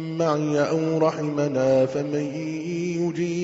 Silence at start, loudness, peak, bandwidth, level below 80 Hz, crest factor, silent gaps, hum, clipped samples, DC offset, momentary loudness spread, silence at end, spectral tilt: 0 s; -24 LUFS; -8 dBFS; 7.8 kHz; -62 dBFS; 14 dB; none; none; under 0.1%; under 0.1%; 7 LU; 0 s; -6.5 dB/octave